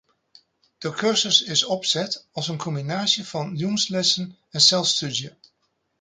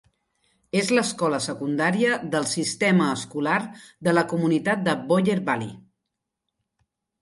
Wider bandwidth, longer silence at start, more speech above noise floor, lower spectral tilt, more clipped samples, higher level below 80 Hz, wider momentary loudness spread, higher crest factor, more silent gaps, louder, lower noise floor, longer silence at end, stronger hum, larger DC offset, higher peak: second, 9.6 kHz vs 11.5 kHz; about the same, 0.8 s vs 0.75 s; second, 49 dB vs 59 dB; second, -2.5 dB/octave vs -5 dB/octave; neither; about the same, -68 dBFS vs -66 dBFS; first, 13 LU vs 6 LU; about the same, 22 dB vs 20 dB; neither; about the same, -21 LUFS vs -23 LUFS; second, -72 dBFS vs -82 dBFS; second, 0.7 s vs 1.4 s; neither; neither; about the same, -4 dBFS vs -6 dBFS